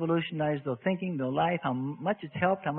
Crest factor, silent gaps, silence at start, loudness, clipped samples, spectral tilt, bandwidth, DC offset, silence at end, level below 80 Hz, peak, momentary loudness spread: 16 dB; none; 0 s; -30 LUFS; under 0.1%; -11 dB/octave; 4 kHz; under 0.1%; 0 s; -68 dBFS; -14 dBFS; 4 LU